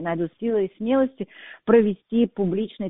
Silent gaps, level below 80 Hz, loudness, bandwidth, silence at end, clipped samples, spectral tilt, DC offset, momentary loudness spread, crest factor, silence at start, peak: none; -56 dBFS; -23 LUFS; 3.9 kHz; 0 s; under 0.1%; -5 dB/octave; under 0.1%; 12 LU; 18 dB; 0 s; -4 dBFS